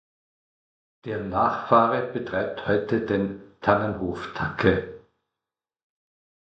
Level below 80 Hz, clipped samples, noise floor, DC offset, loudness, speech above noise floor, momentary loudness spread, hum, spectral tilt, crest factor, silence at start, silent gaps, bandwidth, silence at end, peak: -50 dBFS; under 0.1%; -89 dBFS; under 0.1%; -25 LUFS; 65 dB; 11 LU; none; -8 dB/octave; 24 dB; 1.05 s; none; 8 kHz; 1.6 s; -4 dBFS